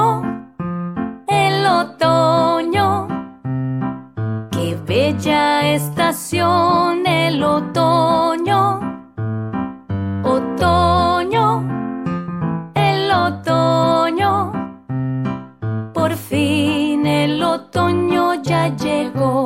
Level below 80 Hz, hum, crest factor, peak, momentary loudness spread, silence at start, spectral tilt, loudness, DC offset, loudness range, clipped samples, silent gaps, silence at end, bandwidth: -50 dBFS; none; 14 dB; -4 dBFS; 10 LU; 0 s; -6 dB/octave; -17 LUFS; under 0.1%; 3 LU; under 0.1%; none; 0 s; 16.5 kHz